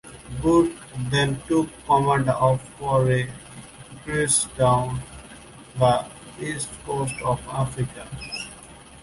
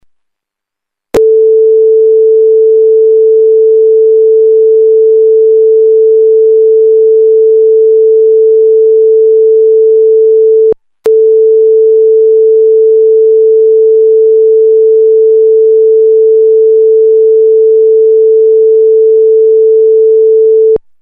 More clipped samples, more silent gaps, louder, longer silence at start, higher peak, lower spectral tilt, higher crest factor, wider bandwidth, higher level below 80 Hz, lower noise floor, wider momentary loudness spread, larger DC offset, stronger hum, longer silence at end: neither; neither; second, -23 LUFS vs -6 LUFS; second, 0.05 s vs 1.15 s; second, -6 dBFS vs 0 dBFS; second, -5 dB/octave vs -6.5 dB/octave; first, 18 dB vs 4 dB; first, 11.5 kHz vs 1.8 kHz; about the same, -46 dBFS vs -50 dBFS; second, -45 dBFS vs -78 dBFS; first, 21 LU vs 0 LU; neither; neither; second, 0 s vs 0.25 s